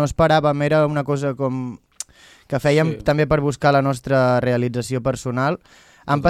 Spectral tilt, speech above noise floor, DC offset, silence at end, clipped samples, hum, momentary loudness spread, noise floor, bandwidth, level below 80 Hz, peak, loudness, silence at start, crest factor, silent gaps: -6.5 dB/octave; 20 dB; under 0.1%; 0 s; under 0.1%; none; 15 LU; -39 dBFS; 13.5 kHz; -44 dBFS; -2 dBFS; -19 LUFS; 0 s; 16 dB; none